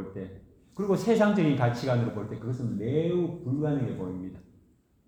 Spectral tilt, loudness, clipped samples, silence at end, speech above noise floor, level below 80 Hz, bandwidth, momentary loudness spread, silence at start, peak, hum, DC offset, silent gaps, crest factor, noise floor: -8 dB/octave; -28 LUFS; under 0.1%; 0.65 s; 35 dB; -60 dBFS; 13 kHz; 16 LU; 0 s; -10 dBFS; none; under 0.1%; none; 18 dB; -63 dBFS